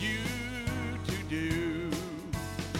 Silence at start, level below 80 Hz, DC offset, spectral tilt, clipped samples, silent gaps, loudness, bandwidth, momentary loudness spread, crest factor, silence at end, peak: 0 s; -48 dBFS; under 0.1%; -5 dB/octave; under 0.1%; none; -34 LUFS; 16.5 kHz; 5 LU; 16 dB; 0 s; -18 dBFS